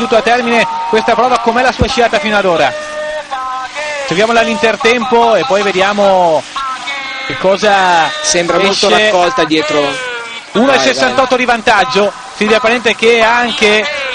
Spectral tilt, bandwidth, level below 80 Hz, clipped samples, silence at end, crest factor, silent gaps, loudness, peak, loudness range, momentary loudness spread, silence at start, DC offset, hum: -3 dB/octave; 10.5 kHz; -38 dBFS; under 0.1%; 0 s; 12 dB; none; -11 LUFS; 0 dBFS; 2 LU; 10 LU; 0 s; under 0.1%; none